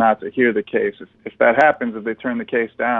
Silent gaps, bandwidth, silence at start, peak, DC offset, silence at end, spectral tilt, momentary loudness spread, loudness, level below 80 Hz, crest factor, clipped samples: none; 7.2 kHz; 0 s; -4 dBFS; under 0.1%; 0 s; -7 dB/octave; 11 LU; -19 LUFS; -60 dBFS; 16 dB; under 0.1%